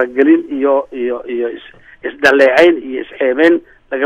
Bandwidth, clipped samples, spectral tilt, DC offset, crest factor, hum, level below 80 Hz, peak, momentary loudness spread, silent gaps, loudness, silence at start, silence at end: 11 kHz; under 0.1%; -4.5 dB/octave; under 0.1%; 14 dB; none; -52 dBFS; 0 dBFS; 16 LU; none; -13 LUFS; 0 s; 0 s